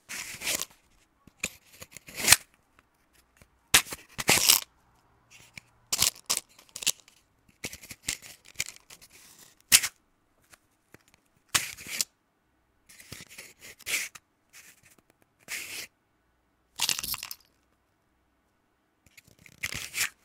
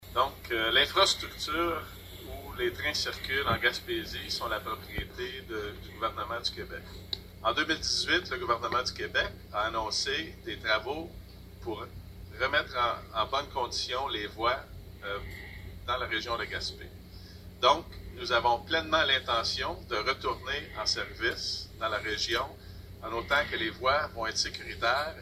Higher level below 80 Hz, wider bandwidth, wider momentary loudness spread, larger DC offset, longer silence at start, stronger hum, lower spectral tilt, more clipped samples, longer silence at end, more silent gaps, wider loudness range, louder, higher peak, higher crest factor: second, -62 dBFS vs -50 dBFS; first, 18 kHz vs 16 kHz; first, 25 LU vs 17 LU; neither; about the same, 0.1 s vs 0 s; second, none vs 60 Hz at -55 dBFS; second, 0.5 dB/octave vs -3 dB/octave; neither; first, 0.15 s vs 0 s; neither; first, 12 LU vs 5 LU; first, -27 LUFS vs -30 LUFS; first, 0 dBFS vs -10 dBFS; first, 34 dB vs 22 dB